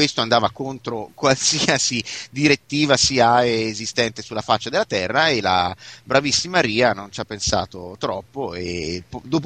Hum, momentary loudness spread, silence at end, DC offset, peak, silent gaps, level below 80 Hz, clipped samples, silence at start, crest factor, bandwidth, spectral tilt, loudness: none; 13 LU; 0 s; under 0.1%; 0 dBFS; none; -50 dBFS; under 0.1%; 0 s; 20 dB; 9.8 kHz; -3 dB/octave; -20 LUFS